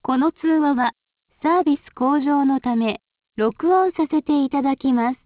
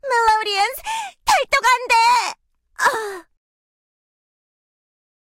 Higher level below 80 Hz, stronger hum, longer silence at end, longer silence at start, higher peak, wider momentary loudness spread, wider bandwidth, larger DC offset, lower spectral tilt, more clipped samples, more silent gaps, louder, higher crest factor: second, -60 dBFS vs -54 dBFS; neither; second, 0.1 s vs 2.2 s; about the same, 0.05 s vs 0.05 s; about the same, -8 dBFS vs -6 dBFS; second, 6 LU vs 12 LU; second, 4 kHz vs 16.5 kHz; neither; first, -10 dB/octave vs 0.5 dB/octave; neither; neither; about the same, -20 LUFS vs -18 LUFS; about the same, 12 dB vs 14 dB